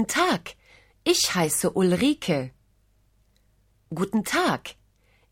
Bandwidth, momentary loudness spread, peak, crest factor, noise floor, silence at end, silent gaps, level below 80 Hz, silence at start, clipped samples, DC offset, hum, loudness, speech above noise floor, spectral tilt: 17 kHz; 15 LU; -8 dBFS; 18 dB; -64 dBFS; 0.6 s; none; -58 dBFS; 0 s; under 0.1%; under 0.1%; 50 Hz at -55 dBFS; -24 LUFS; 40 dB; -3.5 dB/octave